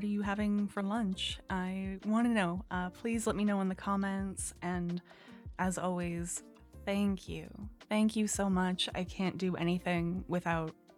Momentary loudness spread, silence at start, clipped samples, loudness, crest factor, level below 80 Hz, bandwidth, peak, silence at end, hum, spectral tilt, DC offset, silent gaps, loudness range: 9 LU; 0 s; under 0.1%; -35 LUFS; 16 dB; -54 dBFS; 15 kHz; -18 dBFS; 0.25 s; none; -5 dB/octave; under 0.1%; none; 4 LU